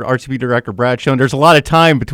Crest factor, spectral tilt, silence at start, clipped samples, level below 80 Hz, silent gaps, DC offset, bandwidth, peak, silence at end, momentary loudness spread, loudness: 12 dB; -6 dB/octave; 0 s; 0.3%; -40 dBFS; none; under 0.1%; 19.5 kHz; 0 dBFS; 0 s; 8 LU; -12 LUFS